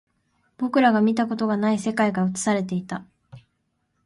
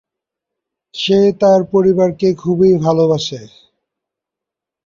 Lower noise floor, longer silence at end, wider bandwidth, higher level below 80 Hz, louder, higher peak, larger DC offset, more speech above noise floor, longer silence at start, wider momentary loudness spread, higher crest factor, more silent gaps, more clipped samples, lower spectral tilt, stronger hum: second, -73 dBFS vs -84 dBFS; second, 0.65 s vs 1.4 s; first, 11.5 kHz vs 7.4 kHz; second, -64 dBFS vs -52 dBFS; second, -22 LUFS vs -13 LUFS; second, -6 dBFS vs -2 dBFS; neither; second, 51 dB vs 71 dB; second, 0.6 s vs 0.95 s; about the same, 11 LU vs 11 LU; about the same, 18 dB vs 14 dB; neither; neither; about the same, -5.5 dB/octave vs -6.5 dB/octave; neither